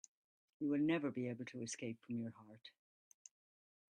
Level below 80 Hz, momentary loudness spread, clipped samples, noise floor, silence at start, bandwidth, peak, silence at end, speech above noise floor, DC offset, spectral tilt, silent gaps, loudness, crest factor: -86 dBFS; 25 LU; under 0.1%; under -90 dBFS; 0.6 s; 10 kHz; -26 dBFS; 1.25 s; over 48 dB; under 0.1%; -5.5 dB/octave; none; -42 LUFS; 20 dB